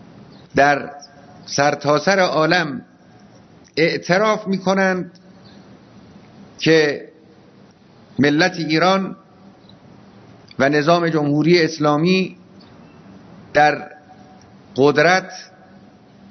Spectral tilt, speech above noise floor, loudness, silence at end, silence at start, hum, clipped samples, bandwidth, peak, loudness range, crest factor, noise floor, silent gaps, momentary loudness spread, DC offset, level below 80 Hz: -5 dB/octave; 31 dB; -17 LUFS; 0.85 s; 0.55 s; none; under 0.1%; 6.4 kHz; 0 dBFS; 3 LU; 20 dB; -48 dBFS; none; 15 LU; under 0.1%; -60 dBFS